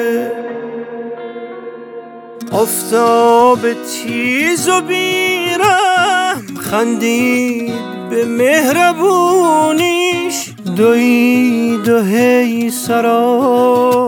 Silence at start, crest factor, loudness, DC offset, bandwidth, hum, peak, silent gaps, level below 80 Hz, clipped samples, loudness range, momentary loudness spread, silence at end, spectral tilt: 0 s; 12 dB; -13 LUFS; under 0.1%; 19 kHz; none; 0 dBFS; none; -58 dBFS; under 0.1%; 3 LU; 15 LU; 0 s; -4 dB/octave